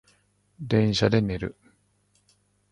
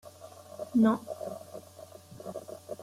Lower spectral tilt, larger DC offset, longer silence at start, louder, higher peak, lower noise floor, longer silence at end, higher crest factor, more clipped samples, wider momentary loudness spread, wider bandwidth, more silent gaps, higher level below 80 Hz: about the same, -6.5 dB/octave vs -7 dB/octave; neither; first, 0.6 s vs 0.05 s; first, -24 LUFS vs -30 LUFS; first, -6 dBFS vs -14 dBFS; first, -67 dBFS vs -51 dBFS; first, 1.2 s vs 0 s; about the same, 20 dB vs 18 dB; neither; second, 15 LU vs 24 LU; second, 10.5 kHz vs 15 kHz; neither; first, -50 dBFS vs -74 dBFS